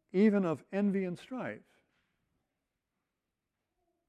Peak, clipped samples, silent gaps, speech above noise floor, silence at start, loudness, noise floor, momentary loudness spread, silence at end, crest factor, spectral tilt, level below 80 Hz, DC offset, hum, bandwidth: -16 dBFS; under 0.1%; none; 56 dB; 0.15 s; -32 LUFS; -88 dBFS; 14 LU; 2.5 s; 20 dB; -8.5 dB/octave; -80 dBFS; under 0.1%; none; 9.2 kHz